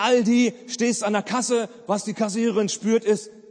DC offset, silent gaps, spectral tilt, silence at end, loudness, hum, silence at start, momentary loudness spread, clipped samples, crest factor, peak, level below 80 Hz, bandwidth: under 0.1%; none; -4 dB/octave; 0.2 s; -23 LUFS; none; 0 s; 7 LU; under 0.1%; 14 dB; -8 dBFS; -74 dBFS; 9.8 kHz